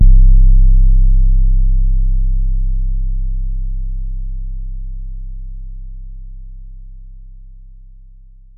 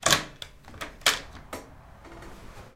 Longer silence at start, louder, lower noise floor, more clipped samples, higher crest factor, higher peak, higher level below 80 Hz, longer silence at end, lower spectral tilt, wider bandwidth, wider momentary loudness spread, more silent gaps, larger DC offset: about the same, 0 s vs 0 s; first, -18 LUFS vs -25 LUFS; second, -39 dBFS vs -48 dBFS; neither; second, 12 dB vs 30 dB; about the same, 0 dBFS vs -2 dBFS; first, -12 dBFS vs -50 dBFS; first, 1.05 s vs 0.05 s; first, -15 dB/octave vs -1 dB/octave; second, 0.3 kHz vs 16 kHz; about the same, 24 LU vs 23 LU; neither; neither